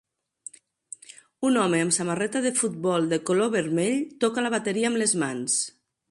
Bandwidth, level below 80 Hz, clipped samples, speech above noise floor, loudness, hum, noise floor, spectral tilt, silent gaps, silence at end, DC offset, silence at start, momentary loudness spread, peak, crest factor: 11.5 kHz; -70 dBFS; under 0.1%; 24 dB; -24 LUFS; none; -48 dBFS; -3.5 dB/octave; none; 0.4 s; under 0.1%; 1.4 s; 20 LU; -8 dBFS; 18 dB